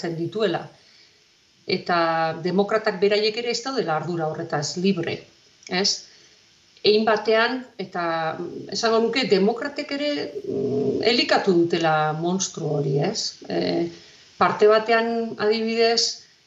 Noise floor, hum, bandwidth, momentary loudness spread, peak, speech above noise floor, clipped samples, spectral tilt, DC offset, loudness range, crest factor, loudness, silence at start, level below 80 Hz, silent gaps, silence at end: -58 dBFS; none; 8 kHz; 10 LU; -6 dBFS; 36 dB; under 0.1%; -4 dB/octave; under 0.1%; 3 LU; 18 dB; -22 LUFS; 0 s; -70 dBFS; none; 0.25 s